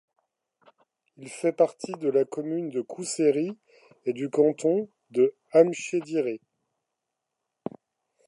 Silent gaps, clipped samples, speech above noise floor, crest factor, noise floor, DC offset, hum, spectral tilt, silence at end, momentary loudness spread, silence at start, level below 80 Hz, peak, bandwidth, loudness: none; under 0.1%; 59 dB; 22 dB; -84 dBFS; under 0.1%; none; -5.5 dB/octave; 1.9 s; 18 LU; 1.2 s; -84 dBFS; -6 dBFS; 11.5 kHz; -26 LUFS